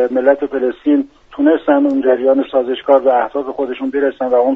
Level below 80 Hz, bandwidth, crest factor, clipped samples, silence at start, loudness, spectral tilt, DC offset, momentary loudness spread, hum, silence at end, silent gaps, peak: -54 dBFS; 4 kHz; 14 dB; under 0.1%; 0 s; -15 LUFS; -3 dB/octave; under 0.1%; 8 LU; none; 0 s; none; 0 dBFS